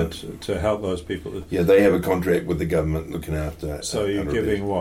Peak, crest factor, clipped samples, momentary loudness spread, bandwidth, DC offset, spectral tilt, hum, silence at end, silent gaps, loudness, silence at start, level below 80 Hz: -6 dBFS; 16 dB; under 0.1%; 12 LU; 16.5 kHz; under 0.1%; -6 dB/octave; none; 0 s; none; -23 LUFS; 0 s; -38 dBFS